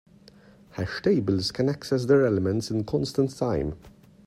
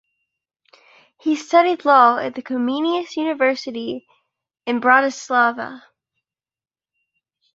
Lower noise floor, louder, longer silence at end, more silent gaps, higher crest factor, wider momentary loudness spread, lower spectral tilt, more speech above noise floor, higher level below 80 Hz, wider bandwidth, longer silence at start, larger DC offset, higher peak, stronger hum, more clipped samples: second, -53 dBFS vs under -90 dBFS; second, -25 LUFS vs -18 LUFS; second, 0.35 s vs 1.75 s; neither; about the same, 18 dB vs 20 dB; second, 13 LU vs 16 LU; first, -6.5 dB/octave vs -3.5 dB/octave; second, 28 dB vs over 72 dB; first, -50 dBFS vs -72 dBFS; first, 14 kHz vs 8 kHz; second, 0.75 s vs 1.25 s; neither; second, -8 dBFS vs -2 dBFS; neither; neither